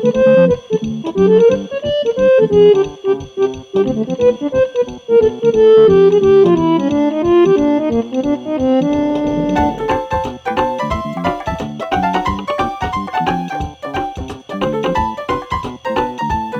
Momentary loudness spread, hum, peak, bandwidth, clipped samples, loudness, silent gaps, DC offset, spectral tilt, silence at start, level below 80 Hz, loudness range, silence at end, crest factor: 11 LU; none; -2 dBFS; 7.8 kHz; under 0.1%; -15 LUFS; none; under 0.1%; -7 dB/octave; 0 s; -36 dBFS; 8 LU; 0 s; 12 dB